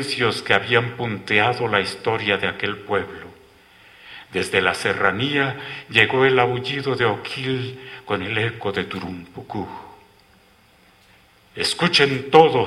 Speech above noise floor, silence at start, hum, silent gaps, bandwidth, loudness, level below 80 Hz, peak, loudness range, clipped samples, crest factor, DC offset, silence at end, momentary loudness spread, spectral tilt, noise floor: 34 dB; 0 s; none; none; 14.5 kHz; -20 LUFS; -56 dBFS; 0 dBFS; 9 LU; under 0.1%; 22 dB; under 0.1%; 0 s; 16 LU; -4.5 dB/octave; -54 dBFS